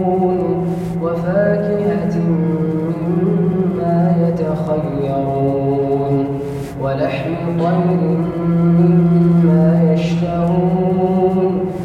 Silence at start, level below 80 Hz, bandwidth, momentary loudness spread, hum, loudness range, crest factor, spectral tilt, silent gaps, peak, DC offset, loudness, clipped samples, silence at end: 0 s; -42 dBFS; 6 kHz; 7 LU; none; 4 LU; 12 dB; -10 dB/octave; none; -2 dBFS; under 0.1%; -16 LUFS; under 0.1%; 0 s